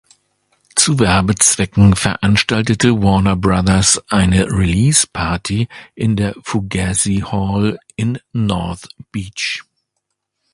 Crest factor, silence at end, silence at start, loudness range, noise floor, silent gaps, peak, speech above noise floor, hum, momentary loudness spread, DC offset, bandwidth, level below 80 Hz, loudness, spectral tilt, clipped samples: 16 dB; 0.9 s; 0.75 s; 6 LU; -74 dBFS; none; 0 dBFS; 59 dB; none; 10 LU; under 0.1%; 11.5 kHz; -32 dBFS; -15 LUFS; -4 dB/octave; under 0.1%